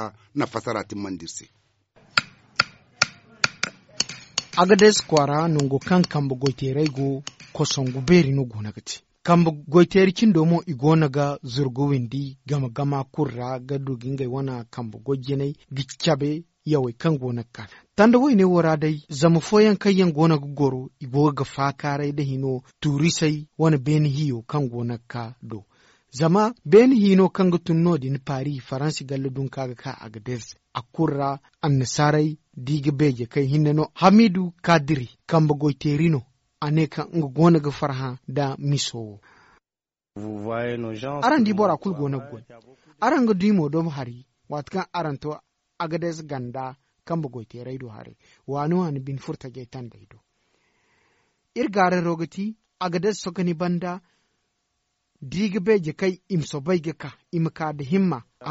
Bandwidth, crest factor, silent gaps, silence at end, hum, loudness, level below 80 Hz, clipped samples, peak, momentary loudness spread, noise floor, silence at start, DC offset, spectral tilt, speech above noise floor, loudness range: 8 kHz; 22 dB; none; 0 s; none; -22 LUFS; -56 dBFS; under 0.1%; 0 dBFS; 16 LU; under -90 dBFS; 0 s; under 0.1%; -6 dB/octave; over 68 dB; 9 LU